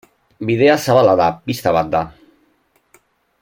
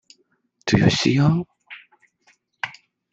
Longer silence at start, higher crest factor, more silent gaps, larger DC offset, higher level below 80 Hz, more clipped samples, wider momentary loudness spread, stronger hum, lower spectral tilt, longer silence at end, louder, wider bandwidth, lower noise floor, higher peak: second, 0.4 s vs 0.65 s; about the same, 16 dB vs 20 dB; neither; neither; about the same, -50 dBFS vs -50 dBFS; neither; second, 10 LU vs 24 LU; neither; about the same, -6 dB/octave vs -5.5 dB/octave; first, 1.3 s vs 0.4 s; first, -15 LUFS vs -20 LUFS; first, 16.5 kHz vs 8 kHz; second, -60 dBFS vs -65 dBFS; about the same, -2 dBFS vs -2 dBFS